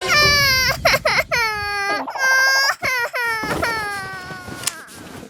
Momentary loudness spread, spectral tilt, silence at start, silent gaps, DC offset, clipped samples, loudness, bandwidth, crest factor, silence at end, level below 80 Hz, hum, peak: 15 LU; -1.5 dB/octave; 0 s; none; under 0.1%; under 0.1%; -17 LUFS; 19.5 kHz; 16 dB; 0 s; -42 dBFS; none; -2 dBFS